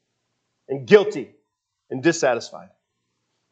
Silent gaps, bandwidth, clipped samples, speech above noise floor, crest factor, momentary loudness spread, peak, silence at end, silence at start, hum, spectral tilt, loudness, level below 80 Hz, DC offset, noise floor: none; 8.2 kHz; under 0.1%; 56 dB; 24 dB; 19 LU; 0 dBFS; 0.9 s; 0.7 s; none; -4.5 dB/octave; -20 LUFS; -78 dBFS; under 0.1%; -76 dBFS